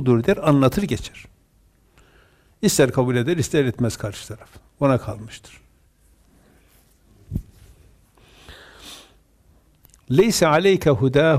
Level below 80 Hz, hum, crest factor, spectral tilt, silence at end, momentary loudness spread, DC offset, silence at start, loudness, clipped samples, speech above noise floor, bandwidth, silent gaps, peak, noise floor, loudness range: -46 dBFS; none; 16 dB; -5.5 dB/octave; 0 s; 24 LU; under 0.1%; 0 s; -19 LUFS; under 0.1%; 39 dB; 15.5 kHz; none; -6 dBFS; -58 dBFS; 19 LU